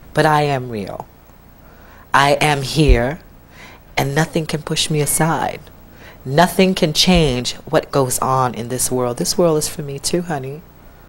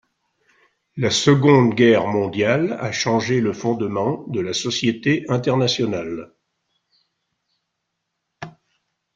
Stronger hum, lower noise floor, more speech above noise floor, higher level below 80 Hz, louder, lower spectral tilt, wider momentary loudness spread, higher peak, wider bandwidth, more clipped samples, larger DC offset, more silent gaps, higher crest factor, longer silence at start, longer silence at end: neither; second, -44 dBFS vs -77 dBFS; second, 27 dB vs 59 dB; first, -30 dBFS vs -58 dBFS; about the same, -17 LUFS vs -19 LUFS; about the same, -4 dB/octave vs -5 dB/octave; second, 12 LU vs 16 LU; about the same, 0 dBFS vs -2 dBFS; first, 16 kHz vs 9.2 kHz; neither; neither; neither; about the same, 18 dB vs 20 dB; second, 0.15 s vs 0.95 s; second, 0.2 s vs 0.65 s